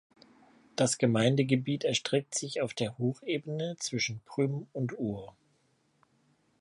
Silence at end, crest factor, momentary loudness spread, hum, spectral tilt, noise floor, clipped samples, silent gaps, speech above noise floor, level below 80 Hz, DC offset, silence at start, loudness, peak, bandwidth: 1.3 s; 20 dB; 10 LU; none; -4.5 dB/octave; -71 dBFS; under 0.1%; none; 41 dB; -70 dBFS; under 0.1%; 0.75 s; -31 LUFS; -12 dBFS; 11.5 kHz